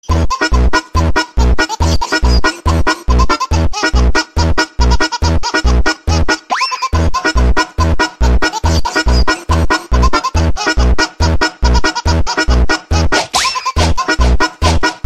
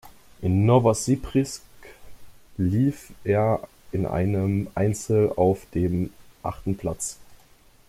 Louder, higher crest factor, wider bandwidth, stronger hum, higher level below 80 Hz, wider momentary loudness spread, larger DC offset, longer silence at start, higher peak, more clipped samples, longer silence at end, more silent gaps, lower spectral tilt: first, -13 LUFS vs -24 LUFS; second, 12 dB vs 18 dB; second, 12.5 kHz vs 15.5 kHz; neither; first, -16 dBFS vs -48 dBFS; second, 2 LU vs 13 LU; first, 3% vs under 0.1%; about the same, 0.05 s vs 0.05 s; first, 0 dBFS vs -6 dBFS; neither; second, 0 s vs 0.55 s; neither; second, -4.5 dB/octave vs -7 dB/octave